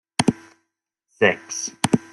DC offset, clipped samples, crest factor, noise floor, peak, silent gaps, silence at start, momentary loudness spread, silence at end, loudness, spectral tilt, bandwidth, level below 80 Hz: under 0.1%; under 0.1%; 22 dB; -78 dBFS; -2 dBFS; none; 0.2 s; 9 LU; 0.15 s; -22 LUFS; -4 dB/octave; 15.5 kHz; -56 dBFS